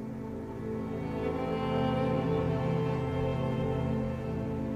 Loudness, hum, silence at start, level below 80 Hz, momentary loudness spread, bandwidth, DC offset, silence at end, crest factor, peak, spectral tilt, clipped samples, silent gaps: -32 LUFS; none; 0 s; -48 dBFS; 7 LU; 9 kHz; under 0.1%; 0 s; 12 dB; -18 dBFS; -8.5 dB/octave; under 0.1%; none